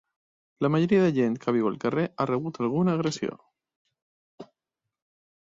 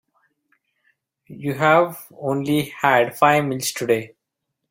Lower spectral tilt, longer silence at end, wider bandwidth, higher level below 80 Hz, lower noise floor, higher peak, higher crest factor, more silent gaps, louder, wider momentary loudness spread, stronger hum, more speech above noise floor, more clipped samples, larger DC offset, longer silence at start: first, -7 dB/octave vs -5 dB/octave; first, 1 s vs 0.65 s; second, 7.8 kHz vs 16.5 kHz; about the same, -66 dBFS vs -62 dBFS; first, -87 dBFS vs -79 dBFS; second, -10 dBFS vs -2 dBFS; about the same, 18 dB vs 20 dB; first, 3.76-3.85 s, 4.02-4.38 s vs none; second, -26 LUFS vs -20 LUFS; second, 8 LU vs 12 LU; neither; about the same, 62 dB vs 59 dB; neither; neither; second, 0.6 s vs 1.3 s